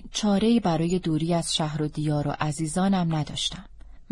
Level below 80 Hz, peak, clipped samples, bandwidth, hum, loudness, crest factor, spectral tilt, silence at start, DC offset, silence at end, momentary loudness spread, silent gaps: -46 dBFS; -10 dBFS; under 0.1%; 11.5 kHz; none; -25 LUFS; 16 dB; -5.5 dB/octave; 0 s; under 0.1%; 0.1 s; 6 LU; none